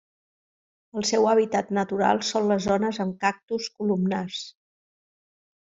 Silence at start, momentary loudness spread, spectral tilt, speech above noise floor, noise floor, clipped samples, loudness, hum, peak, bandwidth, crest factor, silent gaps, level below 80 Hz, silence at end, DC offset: 0.95 s; 11 LU; -4.5 dB/octave; over 66 dB; under -90 dBFS; under 0.1%; -24 LUFS; none; -6 dBFS; 7.8 kHz; 20 dB; 3.43-3.48 s; -62 dBFS; 1.1 s; under 0.1%